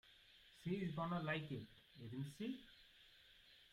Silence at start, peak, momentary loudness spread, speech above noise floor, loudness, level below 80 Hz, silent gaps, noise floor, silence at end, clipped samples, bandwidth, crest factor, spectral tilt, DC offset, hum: 0.05 s; -30 dBFS; 21 LU; 22 dB; -47 LUFS; -74 dBFS; none; -68 dBFS; 0.05 s; under 0.1%; 15.5 kHz; 20 dB; -7 dB/octave; under 0.1%; none